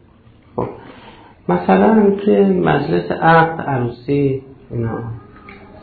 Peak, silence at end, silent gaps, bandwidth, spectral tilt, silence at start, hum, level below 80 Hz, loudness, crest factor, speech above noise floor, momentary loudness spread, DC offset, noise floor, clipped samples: -2 dBFS; 0 s; none; 4.7 kHz; -11.5 dB/octave; 0.55 s; none; -46 dBFS; -16 LUFS; 14 dB; 32 dB; 17 LU; under 0.1%; -47 dBFS; under 0.1%